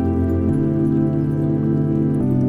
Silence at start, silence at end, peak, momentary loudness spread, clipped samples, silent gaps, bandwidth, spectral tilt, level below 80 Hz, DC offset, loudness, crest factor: 0 s; 0 s; -8 dBFS; 1 LU; under 0.1%; none; 3.3 kHz; -11.5 dB/octave; -40 dBFS; under 0.1%; -19 LUFS; 10 dB